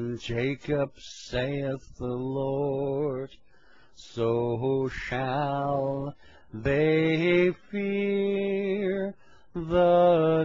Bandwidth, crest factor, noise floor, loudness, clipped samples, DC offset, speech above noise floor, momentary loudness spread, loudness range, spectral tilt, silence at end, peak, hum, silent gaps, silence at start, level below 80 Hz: 7.6 kHz; 16 dB; -60 dBFS; -27 LUFS; under 0.1%; 0.2%; 33 dB; 13 LU; 5 LU; -7.5 dB/octave; 0 s; -12 dBFS; none; none; 0 s; -52 dBFS